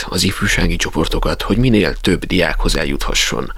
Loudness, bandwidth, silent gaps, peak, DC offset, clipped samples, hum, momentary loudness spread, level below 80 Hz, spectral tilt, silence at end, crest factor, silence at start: -16 LUFS; 16 kHz; none; 0 dBFS; under 0.1%; under 0.1%; none; 4 LU; -22 dBFS; -4 dB/octave; 0 s; 16 dB; 0 s